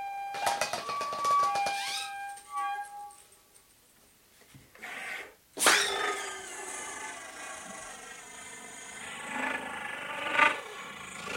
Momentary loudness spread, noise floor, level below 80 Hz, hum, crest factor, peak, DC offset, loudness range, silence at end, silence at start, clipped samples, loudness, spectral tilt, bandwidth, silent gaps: 18 LU; -62 dBFS; -72 dBFS; none; 28 dB; -6 dBFS; under 0.1%; 9 LU; 0 s; 0 s; under 0.1%; -31 LUFS; 0 dB/octave; 16.5 kHz; none